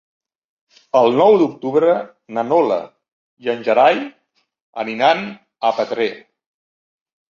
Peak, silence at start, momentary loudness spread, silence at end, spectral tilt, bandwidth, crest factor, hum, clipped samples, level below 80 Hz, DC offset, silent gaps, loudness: -2 dBFS; 0.95 s; 14 LU; 1.1 s; -6 dB/octave; 7.2 kHz; 16 dB; none; under 0.1%; -68 dBFS; under 0.1%; 3.12-3.37 s, 4.62-4.73 s; -17 LUFS